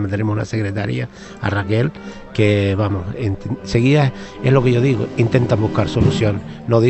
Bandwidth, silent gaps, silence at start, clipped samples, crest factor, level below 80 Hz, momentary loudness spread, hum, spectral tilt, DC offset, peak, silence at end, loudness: 8.4 kHz; none; 0 s; under 0.1%; 16 dB; -40 dBFS; 10 LU; none; -7.5 dB/octave; under 0.1%; 0 dBFS; 0 s; -18 LUFS